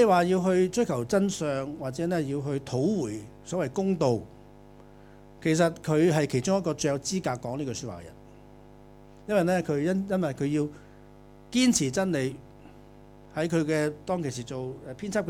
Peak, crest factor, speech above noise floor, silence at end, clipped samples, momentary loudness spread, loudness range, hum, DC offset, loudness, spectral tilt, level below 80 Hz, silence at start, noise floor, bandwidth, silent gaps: -10 dBFS; 18 dB; 24 dB; 0 s; under 0.1%; 12 LU; 3 LU; 50 Hz at -55 dBFS; under 0.1%; -27 LUFS; -5.5 dB/octave; -56 dBFS; 0 s; -51 dBFS; 16 kHz; none